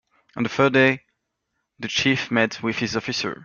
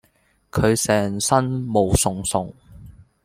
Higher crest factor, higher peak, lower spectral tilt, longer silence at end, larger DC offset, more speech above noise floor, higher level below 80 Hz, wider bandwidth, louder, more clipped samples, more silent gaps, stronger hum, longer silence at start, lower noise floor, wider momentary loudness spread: about the same, 20 dB vs 20 dB; about the same, -4 dBFS vs -2 dBFS; about the same, -4.5 dB/octave vs -4.5 dB/octave; second, 0 s vs 0.35 s; neither; first, 55 dB vs 42 dB; second, -60 dBFS vs -40 dBFS; second, 7.2 kHz vs 16.5 kHz; about the same, -21 LUFS vs -20 LUFS; neither; neither; neither; second, 0.35 s vs 0.55 s; first, -77 dBFS vs -62 dBFS; first, 13 LU vs 8 LU